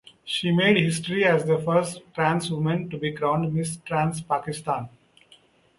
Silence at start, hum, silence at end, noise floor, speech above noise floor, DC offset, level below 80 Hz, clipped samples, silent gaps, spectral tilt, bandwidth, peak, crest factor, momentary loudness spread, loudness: 0.25 s; none; 0.9 s; -57 dBFS; 33 dB; under 0.1%; -60 dBFS; under 0.1%; none; -5.5 dB/octave; 11.5 kHz; -4 dBFS; 20 dB; 10 LU; -24 LUFS